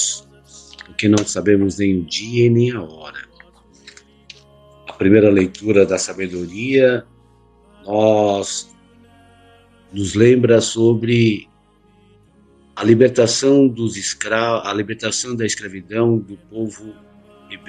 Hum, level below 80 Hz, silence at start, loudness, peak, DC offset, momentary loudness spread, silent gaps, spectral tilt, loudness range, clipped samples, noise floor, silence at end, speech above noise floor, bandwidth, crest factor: none; -54 dBFS; 0 s; -17 LUFS; 0 dBFS; under 0.1%; 16 LU; none; -5 dB/octave; 4 LU; under 0.1%; -54 dBFS; 0.1 s; 38 dB; 10 kHz; 18 dB